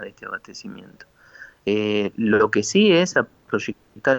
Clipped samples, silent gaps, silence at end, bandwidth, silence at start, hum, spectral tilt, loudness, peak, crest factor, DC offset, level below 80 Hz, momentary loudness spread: under 0.1%; none; 0 s; 19 kHz; 0 s; none; -4.5 dB/octave; -20 LUFS; -6 dBFS; 16 dB; under 0.1%; -62 dBFS; 20 LU